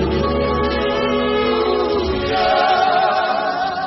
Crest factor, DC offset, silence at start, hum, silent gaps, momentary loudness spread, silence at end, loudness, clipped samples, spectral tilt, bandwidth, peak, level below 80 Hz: 14 dB; under 0.1%; 0 s; none; none; 4 LU; 0 s; -17 LUFS; under 0.1%; -6.5 dB/octave; 6 kHz; -2 dBFS; -34 dBFS